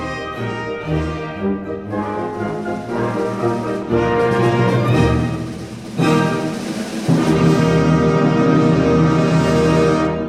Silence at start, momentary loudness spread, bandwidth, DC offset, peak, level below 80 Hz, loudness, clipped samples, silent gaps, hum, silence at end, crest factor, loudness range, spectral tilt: 0 s; 10 LU; 12.5 kHz; under 0.1%; -2 dBFS; -36 dBFS; -17 LUFS; under 0.1%; none; none; 0 s; 14 dB; 7 LU; -7 dB/octave